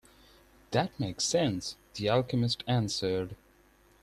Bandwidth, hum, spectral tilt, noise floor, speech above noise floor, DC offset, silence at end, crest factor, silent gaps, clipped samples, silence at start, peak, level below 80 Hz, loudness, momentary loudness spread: 14 kHz; none; -5 dB/octave; -62 dBFS; 32 dB; under 0.1%; 0.65 s; 18 dB; none; under 0.1%; 0.7 s; -12 dBFS; -60 dBFS; -31 LUFS; 7 LU